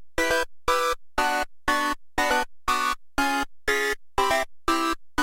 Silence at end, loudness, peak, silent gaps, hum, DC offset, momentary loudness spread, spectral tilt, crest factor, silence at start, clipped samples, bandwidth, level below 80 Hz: 0 s; -25 LUFS; -8 dBFS; none; none; under 0.1%; 3 LU; -2 dB/octave; 16 dB; 0 s; under 0.1%; 16 kHz; -42 dBFS